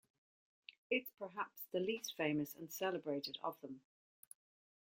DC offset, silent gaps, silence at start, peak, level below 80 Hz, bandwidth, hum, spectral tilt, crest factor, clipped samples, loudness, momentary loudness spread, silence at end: under 0.1%; 0.78-0.90 s; 0.7 s; -22 dBFS; -86 dBFS; 16.5 kHz; none; -4 dB/octave; 22 dB; under 0.1%; -42 LUFS; 21 LU; 1 s